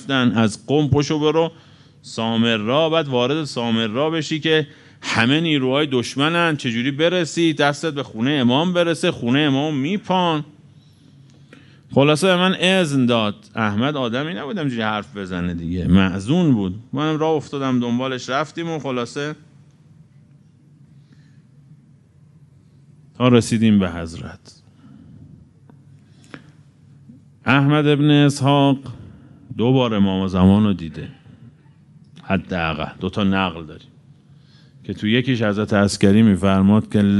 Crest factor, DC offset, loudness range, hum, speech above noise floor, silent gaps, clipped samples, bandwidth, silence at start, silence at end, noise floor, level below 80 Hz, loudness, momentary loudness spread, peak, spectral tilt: 20 dB; under 0.1%; 7 LU; none; 32 dB; none; under 0.1%; 11.5 kHz; 0 s; 0 s; -50 dBFS; -50 dBFS; -19 LUFS; 11 LU; 0 dBFS; -6 dB/octave